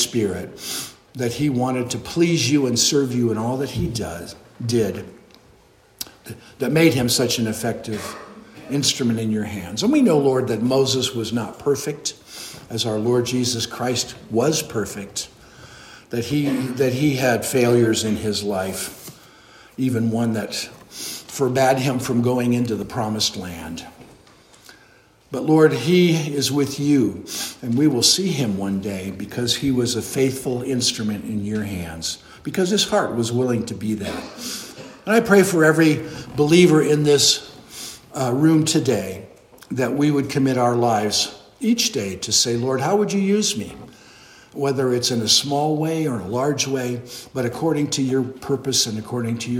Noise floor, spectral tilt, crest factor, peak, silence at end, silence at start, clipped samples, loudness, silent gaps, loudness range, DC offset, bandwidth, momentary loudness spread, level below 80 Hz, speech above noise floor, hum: -53 dBFS; -4.5 dB/octave; 20 dB; 0 dBFS; 0 s; 0 s; under 0.1%; -20 LUFS; none; 6 LU; under 0.1%; 16.5 kHz; 15 LU; -54 dBFS; 33 dB; none